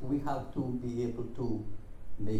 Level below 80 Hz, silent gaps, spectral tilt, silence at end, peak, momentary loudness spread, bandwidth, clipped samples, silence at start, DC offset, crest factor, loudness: -46 dBFS; none; -8.5 dB/octave; 0 s; -20 dBFS; 14 LU; 12 kHz; under 0.1%; 0 s; under 0.1%; 12 dB; -36 LUFS